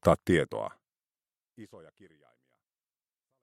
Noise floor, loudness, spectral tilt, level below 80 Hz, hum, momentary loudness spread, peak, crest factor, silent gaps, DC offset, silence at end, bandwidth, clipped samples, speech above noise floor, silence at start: under -90 dBFS; -29 LUFS; -6.5 dB/octave; -56 dBFS; none; 26 LU; -6 dBFS; 26 dB; none; under 0.1%; 1.65 s; 16 kHz; under 0.1%; over 60 dB; 0.05 s